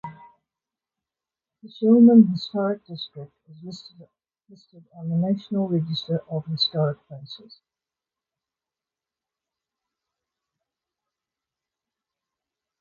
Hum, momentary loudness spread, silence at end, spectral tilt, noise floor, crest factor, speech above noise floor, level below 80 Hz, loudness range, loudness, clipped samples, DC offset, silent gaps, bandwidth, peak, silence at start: none; 26 LU; 5.45 s; -8.5 dB/octave; -90 dBFS; 22 dB; 67 dB; -70 dBFS; 9 LU; -21 LUFS; under 0.1%; under 0.1%; none; 7 kHz; -4 dBFS; 0.05 s